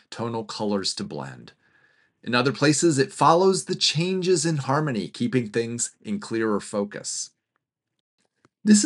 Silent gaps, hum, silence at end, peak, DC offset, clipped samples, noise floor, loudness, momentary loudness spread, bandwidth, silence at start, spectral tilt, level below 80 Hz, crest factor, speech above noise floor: 8.00-8.18 s; none; 0 s; -4 dBFS; under 0.1%; under 0.1%; -79 dBFS; -23 LUFS; 12 LU; 11.5 kHz; 0.1 s; -4 dB/octave; -74 dBFS; 20 dB; 55 dB